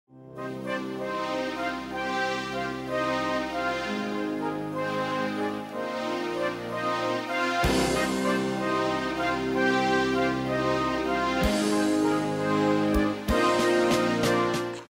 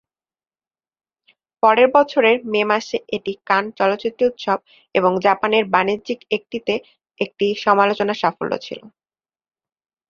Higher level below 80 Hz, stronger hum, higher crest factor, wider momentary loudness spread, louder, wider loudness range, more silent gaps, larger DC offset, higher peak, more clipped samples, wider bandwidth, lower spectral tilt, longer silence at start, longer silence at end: first, -44 dBFS vs -64 dBFS; neither; about the same, 16 dB vs 20 dB; second, 7 LU vs 11 LU; second, -27 LUFS vs -19 LUFS; about the same, 5 LU vs 4 LU; neither; neither; second, -12 dBFS vs 0 dBFS; neither; first, 16 kHz vs 7.2 kHz; about the same, -5 dB/octave vs -5 dB/octave; second, 0.15 s vs 1.65 s; second, 0.05 s vs 1.2 s